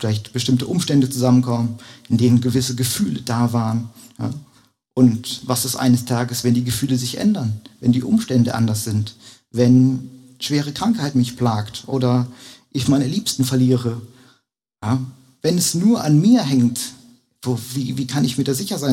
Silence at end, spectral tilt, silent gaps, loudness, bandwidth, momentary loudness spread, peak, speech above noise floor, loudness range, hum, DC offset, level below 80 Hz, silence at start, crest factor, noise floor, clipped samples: 0 s; -5.5 dB/octave; none; -19 LUFS; 16.5 kHz; 13 LU; -2 dBFS; 45 dB; 2 LU; none; under 0.1%; -54 dBFS; 0 s; 16 dB; -63 dBFS; under 0.1%